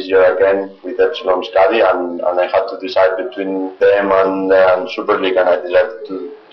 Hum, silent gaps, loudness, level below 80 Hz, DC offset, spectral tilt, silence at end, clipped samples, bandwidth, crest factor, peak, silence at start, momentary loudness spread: none; none; -14 LUFS; -54 dBFS; under 0.1%; -2 dB/octave; 0.15 s; under 0.1%; 6.2 kHz; 10 dB; -4 dBFS; 0 s; 9 LU